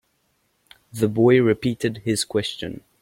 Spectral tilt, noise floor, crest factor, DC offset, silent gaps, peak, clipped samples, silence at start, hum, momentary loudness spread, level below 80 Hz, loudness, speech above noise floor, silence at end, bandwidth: -5.5 dB/octave; -68 dBFS; 18 dB; under 0.1%; none; -4 dBFS; under 0.1%; 0.95 s; none; 17 LU; -56 dBFS; -21 LUFS; 48 dB; 0.25 s; 16.5 kHz